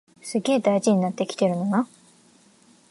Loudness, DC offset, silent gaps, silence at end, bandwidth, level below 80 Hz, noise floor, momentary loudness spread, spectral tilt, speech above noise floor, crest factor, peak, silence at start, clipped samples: -23 LUFS; under 0.1%; none; 1.05 s; 11.5 kHz; -76 dBFS; -56 dBFS; 7 LU; -6 dB/octave; 34 dB; 16 dB; -8 dBFS; 0.25 s; under 0.1%